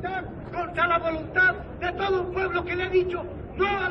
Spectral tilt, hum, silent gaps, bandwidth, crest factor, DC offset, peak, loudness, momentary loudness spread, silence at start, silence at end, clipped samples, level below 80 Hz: -7 dB/octave; none; none; 6 kHz; 14 dB; under 0.1%; -12 dBFS; -26 LUFS; 11 LU; 0 s; 0 s; under 0.1%; -44 dBFS